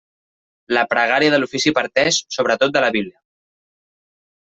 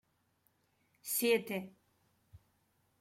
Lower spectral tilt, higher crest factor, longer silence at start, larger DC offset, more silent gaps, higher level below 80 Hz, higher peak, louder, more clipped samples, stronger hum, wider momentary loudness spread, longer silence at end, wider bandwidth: about the same, -3 dB/octave vs -3 dB/octave; about the same, 18 dB vs 22 dB; second, 0.7 s vs 1.05 s; neither; neither; first, -62 dBFS vs -78 dBFS; first, -2 dBFS vs -18 dBFS; first, -17 LUFS vs -34 LUFS; neither; neither; second, 5 LU vs 19 LU; first, 1.3 s vs 0.65 s; second, 8.2 kHz vs 16.5 kHz